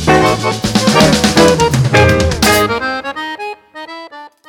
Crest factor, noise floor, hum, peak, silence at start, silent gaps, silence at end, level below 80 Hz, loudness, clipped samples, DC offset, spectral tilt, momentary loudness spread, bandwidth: 12 dB; -33 dBFS; none; 0 dBFS; 0 s; none; 0.2 s; -30 dBFS; -11 LUFS; under 0.1%; under 0.1%; -4.5 dB/octave; 19 LU; 19.5 kHz